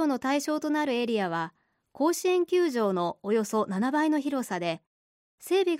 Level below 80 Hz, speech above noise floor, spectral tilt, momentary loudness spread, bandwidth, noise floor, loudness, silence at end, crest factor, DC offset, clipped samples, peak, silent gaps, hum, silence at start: -78 dBFS; over 63 dB; -5 dB/octave; 7 LU; 16 kHz; under -90 dBFS; -27 LUFS; 0 s; 12 dB; under 0.1%; under 0.1%; -14 dBFS; 4.87-5.38 s; none; 0 s